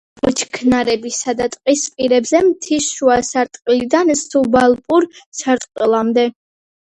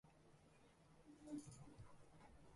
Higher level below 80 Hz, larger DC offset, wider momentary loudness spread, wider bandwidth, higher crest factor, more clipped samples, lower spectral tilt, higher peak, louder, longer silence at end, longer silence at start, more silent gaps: first, -50 dBFS vs -76 dBFS; neither; second, 6 LU vs 13 LU; about the same, 11 kHz vs 11.5 kHz; about the same, 16 dB vs 20 dB; neither; second, -3 dB/octave vs -5.5 dB/octave; first, 0 dBFS vs -42 dBFS; first, -16 LUFS vs -60 LUFS; first, 0.65 s vs 0 s; first, 0.25 s vs 0.05 s; first, 5.26-5.32 s vs none